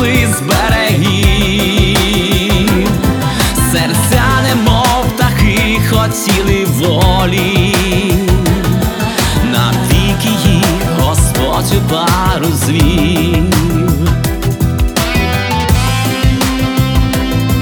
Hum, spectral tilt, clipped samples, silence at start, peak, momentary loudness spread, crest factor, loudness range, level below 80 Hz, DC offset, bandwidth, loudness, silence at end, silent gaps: none; -5 dB/octave; under 0.1%; 0 s; 0 dBFS; 3 LU; 10 dB; 2 LU; -20 dBFS; under 0.1%; over 20 kHz; -11 LUFS; 0 s; none